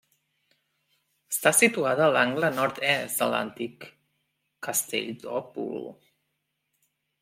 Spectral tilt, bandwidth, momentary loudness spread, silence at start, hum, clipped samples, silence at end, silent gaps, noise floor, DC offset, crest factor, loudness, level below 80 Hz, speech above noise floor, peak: -2.5 dB/octave; 16.5 kHz; 16 LU; 1.3 s; none; under 0.1%; 1.3 s; none; -79 dBFS; under 0.1%; 22 dB; -25 LUFS; -76 dBFS; 53 dB; -6 dBFS